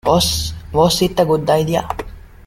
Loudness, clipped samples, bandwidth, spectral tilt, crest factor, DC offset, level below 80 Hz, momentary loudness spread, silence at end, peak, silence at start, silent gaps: -16 LUFS; under 0.1%; 16.5 kHz; -4.5 dB/octave; 16 dB; under 0.1%; -34 dBFS; 13 LU; 0.2 s; 0 dBFS; 0.05 s; none